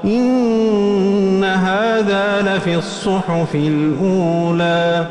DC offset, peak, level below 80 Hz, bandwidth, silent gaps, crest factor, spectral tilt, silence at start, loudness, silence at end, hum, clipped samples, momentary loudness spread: under 0.1%; -6 dBFS; -48 dBFS; 10.5 kHz; none; 10 dB; -6.5 dB/octave; 0 s; -16 LUFS; 0 s; none; under 0.1%; 3 LU